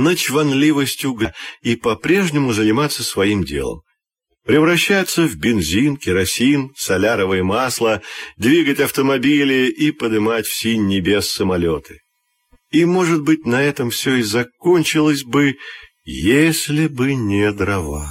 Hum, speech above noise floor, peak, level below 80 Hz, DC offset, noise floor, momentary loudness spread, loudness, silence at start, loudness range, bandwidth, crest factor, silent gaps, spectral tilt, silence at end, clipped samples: none; 56 dB; -2 dBFS; -42 dBFS; under 0.1%; -73 dBFS; 7 LU; -17 LUFS; 0 s; 2 LU; 16.5 kHz; 14 dB; none; -4.5 dB/octave; 0 s; under 0.1%